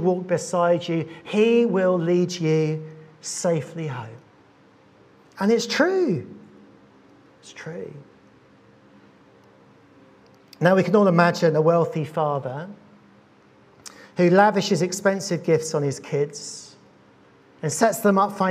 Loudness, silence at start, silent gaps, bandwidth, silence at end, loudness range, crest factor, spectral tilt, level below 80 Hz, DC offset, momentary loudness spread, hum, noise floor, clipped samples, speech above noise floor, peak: -21 LUFS; 0 s; none; 15.5 kHz; 0 s; 14 LU; 22 dB; -5.5 dB/octave; -74 dBFS; under 0.1%; 19 LU; none; -54 dBFS; under 0.1%; 33 dB; -2 dBFS